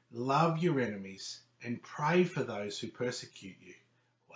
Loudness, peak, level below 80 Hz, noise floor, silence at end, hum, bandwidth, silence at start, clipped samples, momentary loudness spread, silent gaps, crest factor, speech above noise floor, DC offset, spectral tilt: -34 LUFS; -14 dBFS; -76 dBFS; -68 dBFS; 0 s; none; 8 kHz; 0.1 s; under 0.1%; 15 LU; none; 20 dB; 35 dB; under 0.1%; -6 dB/octave